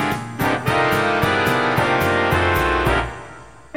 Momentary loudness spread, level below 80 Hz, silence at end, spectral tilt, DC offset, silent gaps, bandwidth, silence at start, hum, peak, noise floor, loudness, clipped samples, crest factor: 6 LU; -34 dBFS; 0.25 s; -5.5 dB/octave; 0.4%; none; 16.5 kHz; 0 s; none; -4 dBFS; -40 dBFS; -18 LUFS; under 0.1%; 16 dB